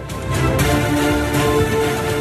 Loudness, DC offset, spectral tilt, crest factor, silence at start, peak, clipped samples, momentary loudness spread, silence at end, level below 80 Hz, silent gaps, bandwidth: -17 LUFS; under 0.1%; -5.5 dB/octave; 12 dB; 0 s; -6 dBFS; under 0.1%; 3 LU; 0 s; -30 dBFS; none; 14 kHz